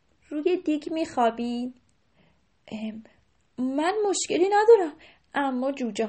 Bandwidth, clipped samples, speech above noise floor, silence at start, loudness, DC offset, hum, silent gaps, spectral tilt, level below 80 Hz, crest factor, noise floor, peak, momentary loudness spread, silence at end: 8.8 kHz; under 0.1%; 40 dB; 0.3 s; -25 LUFS; under 0.1%; none; none; -3.5 dB/octave; -68 dBFS; 20 dB; -65 dBFS; -6 dBFS; 17 LU; 0 s